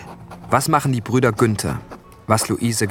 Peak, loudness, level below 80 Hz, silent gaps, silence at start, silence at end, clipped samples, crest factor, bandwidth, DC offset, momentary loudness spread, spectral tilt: -2 dBFS; -19 LUFS; -48 dBFS; none; 0 s; 0 s; under 0.1%; 18 dB; 18 kHz; under 0.1%; 18 LU; -5 dB/octave